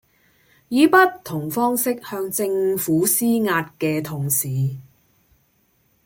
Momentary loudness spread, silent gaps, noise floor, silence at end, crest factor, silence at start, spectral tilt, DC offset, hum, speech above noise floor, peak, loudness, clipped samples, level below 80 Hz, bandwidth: 11 LU; none; -63 dBFS; 1.25 s; 20 dB; 0.7 s; -4.5 dB/octave; under 0.1%; none; 43 dB; -2 dBFS; -20 LUFS; under 0.1%; -62 dBFS; 17 kHz